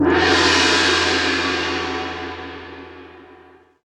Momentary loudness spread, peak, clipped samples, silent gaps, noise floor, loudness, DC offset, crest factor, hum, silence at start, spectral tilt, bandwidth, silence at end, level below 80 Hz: 20 LU; -2 dBFS; under 0.1%; none; -48 dBFS; -16 LUFS; under 0.1%; 16 dB; none; 0 s; -3 dB/octave; 12.5 kHz; 0.6 s; -44 dBFS